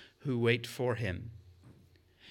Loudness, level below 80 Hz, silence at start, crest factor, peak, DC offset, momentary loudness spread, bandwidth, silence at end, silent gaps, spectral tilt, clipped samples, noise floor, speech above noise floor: -33 LUFS; -70 dBFS; 0 s; 22 dB; -14 dBFS; under 0.1%; 13 LU; 17 kHz; 0 s; none; -6 dB/octave; under 0.1%; -63 dBFS; 30 dB